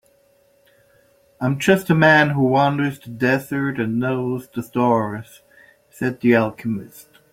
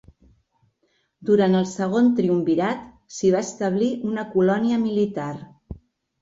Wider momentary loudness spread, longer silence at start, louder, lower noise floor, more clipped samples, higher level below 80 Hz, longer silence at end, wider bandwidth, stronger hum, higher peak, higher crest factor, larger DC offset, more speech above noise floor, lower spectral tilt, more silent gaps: second, 13 LU vs 19 LU; first, 1.4 s vs 1.2 s; first, -19 LUFS vs -22 LUFS; second, -58 dBFS vs -69 dBFS; neither; about the same, -58 dBFS vs -54 dBFS; second, 0.3 s vs 0.45 s; first, 16.5 kHz vs 8 kHz; neither; first, -2 dBFS vs -8 dBFS; about the same, 18 dB vs 16 dB; neither; second, 39 dB vs 48 dB; about the same, -6.5 dB/octave vs -6.5 dB/octave; neither